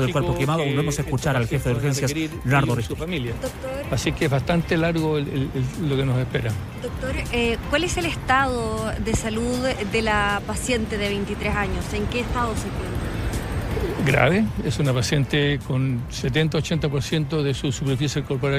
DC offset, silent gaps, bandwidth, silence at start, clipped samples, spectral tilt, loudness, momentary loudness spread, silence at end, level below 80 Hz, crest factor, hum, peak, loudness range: under 0.1%; none; 15.5 kHz; 0 s; under 0.1%; -5.5 dB/octave; -23 LUFS; 7 LU; 0 s; -36 dBFS; 20 dB; none; -2 dBFS; 2 LU